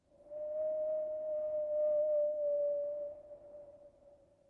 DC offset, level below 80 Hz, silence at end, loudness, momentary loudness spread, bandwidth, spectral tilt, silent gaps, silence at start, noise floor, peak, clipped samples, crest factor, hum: under 0.1%; -76 dBFS; 0.4 s; -36 LUFS; 20 LU; 2.1 kHz; -8 dB/octave; none; 0.2 s; -64 dBFS; -28 dBFS; under 0.1%; 10 dB; none